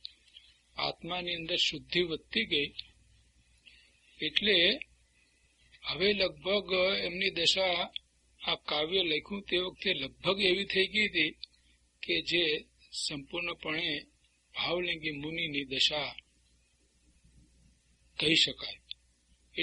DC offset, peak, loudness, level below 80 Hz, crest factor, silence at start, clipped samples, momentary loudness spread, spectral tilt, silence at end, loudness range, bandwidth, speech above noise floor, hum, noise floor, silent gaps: under 0.1%; -8 dBFS; -30 LUFS; -62 dBFS; 26 dB; 0.35 s; under 0.1%; 16 LU; -3 dB/octave; 0 s; 4 LU; 11.5 kHz; 38 dB; 60 Hz at -65 dBFS; -69 dBFS; none